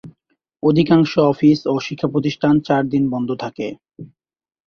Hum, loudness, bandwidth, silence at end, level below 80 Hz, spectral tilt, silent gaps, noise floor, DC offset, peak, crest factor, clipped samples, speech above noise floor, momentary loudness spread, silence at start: none; -17 LUFS; 6.6 kHz; 0.6 s; -54 dBFS; -7.5 dB/octave; none; -67 dBFS; under 0.1%; -2 dBFS; 16 dB; under 0.1%; 50 dB; 12 LU; 0.05 s